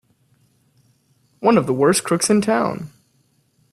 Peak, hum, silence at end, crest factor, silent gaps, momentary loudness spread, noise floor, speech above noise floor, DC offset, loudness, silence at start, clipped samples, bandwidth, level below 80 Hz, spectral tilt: -2 dBFS; none; 0.85 s; 20 dB; none; 11 LU; -62 dBFS; 45 dB; under 0.1%; -18 LUFS; 1.4 s; under 0.1%; 14.5 kHz; -60 dBFS; -4.5 dB/octave